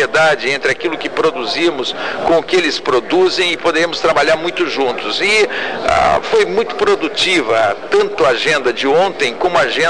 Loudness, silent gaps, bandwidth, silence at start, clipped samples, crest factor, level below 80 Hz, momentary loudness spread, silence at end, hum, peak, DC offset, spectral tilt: -14 LUFS; none; 10.5 kHz; 0 s; under 0.1%; 12 dB; -46 dBFS; 4 LU; 0 s; none; -2 dBFS; 2%; -3 dB/octave